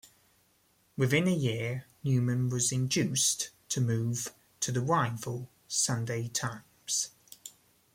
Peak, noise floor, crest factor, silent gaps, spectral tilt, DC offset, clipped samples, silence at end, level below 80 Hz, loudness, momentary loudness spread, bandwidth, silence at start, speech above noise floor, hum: -14 dBFS; -69 dBFS; 18 dB; none; -4 dB/octave; under 0.1%; under 0.1%; 0.45 s; -68 dBFS; -30 LUFS; 14 LU; 16.5 kHz; 0.95 s; 39 dB; none